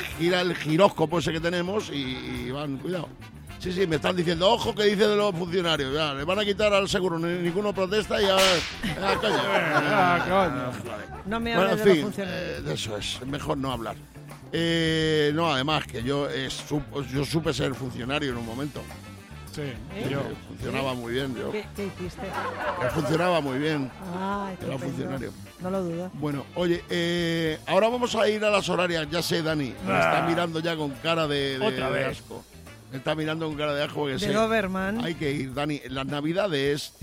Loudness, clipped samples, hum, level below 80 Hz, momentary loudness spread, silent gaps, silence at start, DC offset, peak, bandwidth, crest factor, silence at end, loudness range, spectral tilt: -26 LUFS; under 0.1%; none; -50 dBFS; 12 LU; none; 0 s; under 0.1%; -6 dBFS; 16 kHz; 22 dB; 0.15 s; 7 LU; -5 dB/octave